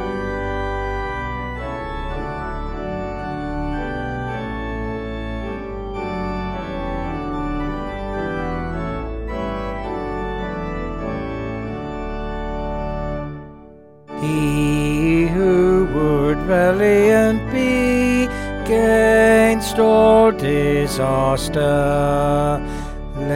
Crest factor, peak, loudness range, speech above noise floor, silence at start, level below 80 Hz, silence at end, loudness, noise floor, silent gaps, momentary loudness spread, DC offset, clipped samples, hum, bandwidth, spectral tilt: 16 dB; -2 dBFS; 11 LU; 28 dB; 0 s; -30 dBFS; 0 s; -20 LUFS; -43 dBFS; none; 14 LU; under 0.1%; under 0.1%; none; 16.5 kHz; -6.5 dB/octave